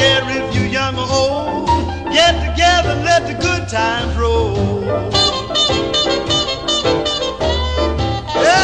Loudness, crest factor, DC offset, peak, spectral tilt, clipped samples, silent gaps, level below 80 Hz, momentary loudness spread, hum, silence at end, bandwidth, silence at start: -15 LUFS; 16 dB; 0.4%; 0 dBFS; -4 dB/octave; under 0.1%; none; -28 dBFS; 5 LU; none; 0 s; 10 kHz; 0 s